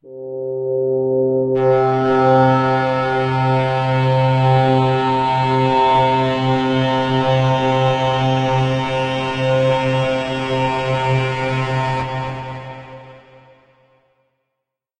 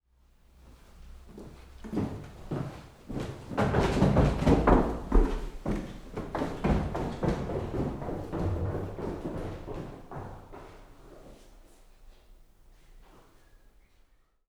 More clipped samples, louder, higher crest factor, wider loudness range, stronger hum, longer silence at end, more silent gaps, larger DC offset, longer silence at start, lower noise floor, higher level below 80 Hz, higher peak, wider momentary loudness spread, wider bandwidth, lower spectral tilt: neither; first, -17 LUFS vs -31 LUFS; second, 14 dB vs 24 dB; second, 7 LU vs 16 LU; neither; first, 1.8 s vs 0.9 s; neither; neither; second, 0.05 s vs 0.65 s; first, -79 dBFS vs -63 dBFS; second, -48 dBFS vs -36 dBFS; first, -2 dBFS vs -6 dBFS; second, 8 LU vs 24 LU; second, 8.8 kHz vs 13.5 kHz; about the same, -7 dB/octave vs -7.5 dB/octave